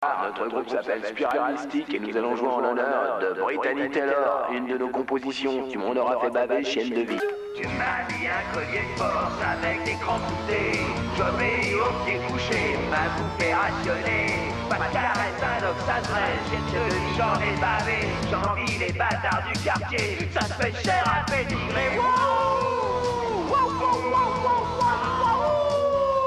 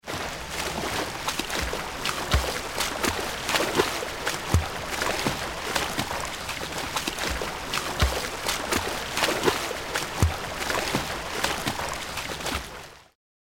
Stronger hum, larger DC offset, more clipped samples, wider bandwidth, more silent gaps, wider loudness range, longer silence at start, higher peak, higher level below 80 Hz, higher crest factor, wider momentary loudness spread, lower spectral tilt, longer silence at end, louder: neither; neither; neither; second, 13 kHz vs 17 kHz; neither; about the same, 3 LU vs 2 LU; about the same, 0 s vs 0.05 s; second, -10 dBFS vs -6 dBFS; second, -44 dBFS vs -38 dBFS; second, 14 dB vs 22 dB; about the same, 5 LU vs 6 LU; first, -5 dB/octave vs -3 dB/octave; second, 0 s vs 0.5 s; about the same, -25 LUFS vs -27 LUFS